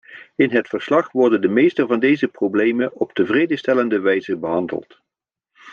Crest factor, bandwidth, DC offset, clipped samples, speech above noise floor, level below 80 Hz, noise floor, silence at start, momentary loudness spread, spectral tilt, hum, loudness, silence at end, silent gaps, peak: 16 dB; 7 kHz; under 0.1%; under 0.1%; 67 dB; -68 dBFS; -85 dBFS; 0.1 s; 6 LU; -7 dB/octave; none; -18 LUFS; 0 s; none; -4 dBFS